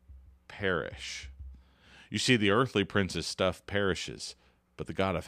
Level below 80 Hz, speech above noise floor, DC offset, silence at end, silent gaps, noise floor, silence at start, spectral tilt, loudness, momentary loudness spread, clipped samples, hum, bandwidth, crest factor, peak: -54 dBFS; 27 dB; under 0.1%; 0 s; none; -58 dBFS; 0.1 s; -4.5 dB/octave; -30 LUFS; 19 LU; under 0.1%; none; 15 kHz; 22 dB; -10 dBFS